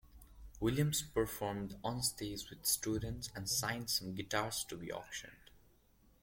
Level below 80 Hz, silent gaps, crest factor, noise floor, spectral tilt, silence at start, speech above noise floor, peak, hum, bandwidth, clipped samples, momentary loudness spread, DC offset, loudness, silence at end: -58 dBFS; none; 20 dB; -69 dBFS; -3.5 dB/octave; 0.05 s; 30 dB; -20 dBFS; none; 16.5 kHz; under 0.1%; 9 LU; under 0.1%; -38 LUFS; 0.65 s